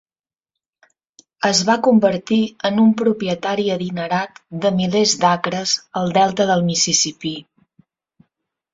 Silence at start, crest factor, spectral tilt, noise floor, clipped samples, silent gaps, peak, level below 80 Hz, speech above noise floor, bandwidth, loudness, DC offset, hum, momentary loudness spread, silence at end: 1.4 s; 18 dB; -4 dB/octave; under -90 dBFS; under 0.1%; none; -2 dBFS; -60 dBFS; over 73 dB; 7.8 kHz; -17 LUFS; under 0.1%; none; 7 LU; 1.3 s